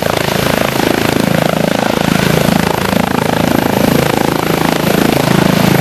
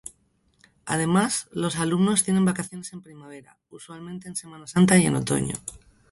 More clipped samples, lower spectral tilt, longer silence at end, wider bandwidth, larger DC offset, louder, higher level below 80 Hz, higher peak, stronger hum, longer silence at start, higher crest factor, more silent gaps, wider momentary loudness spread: first, 0.8% vs under 0.1%; about the same, -5 dB/octave vs -5 dB/octave; second, 0 s vs 0.35 s; first, 16 kHz vs 12 kHz; neither; first, -12 LUFS vs -23 LUFS; first, -34 dBFS vs -56 dBFS; first, 0 dBFS vs -6 dBFS; neither; second, 0 s vs 0.85 s; second, 12 dB vs 20 dB; neither; second, 2 LU vs 24 LU